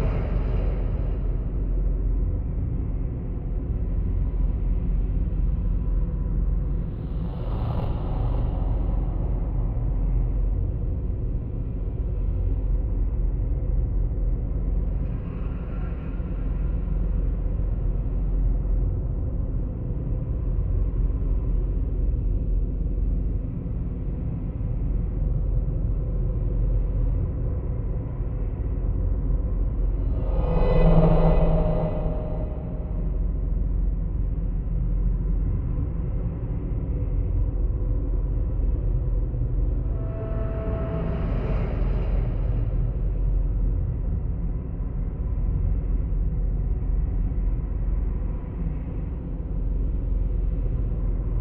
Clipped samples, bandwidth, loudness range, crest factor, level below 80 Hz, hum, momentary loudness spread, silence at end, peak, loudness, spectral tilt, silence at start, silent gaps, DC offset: under 0.1%; 3.2 kHz; 5 LU; 18 dB; -24 dBFS; none; 4 LU; 0 s; -6 dBFS; -28 LUFS; -12.5 dB/octave; 0 s; none; under 0.1%